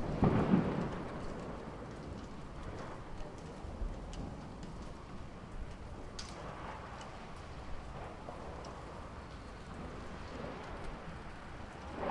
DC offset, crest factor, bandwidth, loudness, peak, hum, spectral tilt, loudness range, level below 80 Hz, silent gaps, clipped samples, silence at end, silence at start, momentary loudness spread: under 0.1%; 24 dB; 11.5 kHz; -42 LUFS; -16 dBFS; none; -7 dB/octave; 8 LU; -50 dBFS; none; under 0.1%; 0 s; 0 s; 12 LU